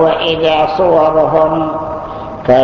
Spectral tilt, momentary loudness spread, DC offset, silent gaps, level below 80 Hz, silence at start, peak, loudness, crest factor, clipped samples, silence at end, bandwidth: -7 dB/octave; 12 LU; under 0.1%; none; -38 dBFS; 0 s; 0 dBFS; -12 LUFS; 12 dB; under 0.1%; 0 s; 6.6 kHz